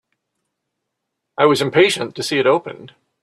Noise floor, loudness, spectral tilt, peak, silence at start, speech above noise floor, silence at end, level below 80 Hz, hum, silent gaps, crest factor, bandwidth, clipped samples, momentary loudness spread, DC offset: -78 dBFS; -16 LUFS; -4.5 dB/octave; -2 dBFS; 1.4 s; 61 dB; 0.35 s; -62 dBFS; none; none; 18 dB; 13 kHz; under 0.1%; 13 LU; under 0.1%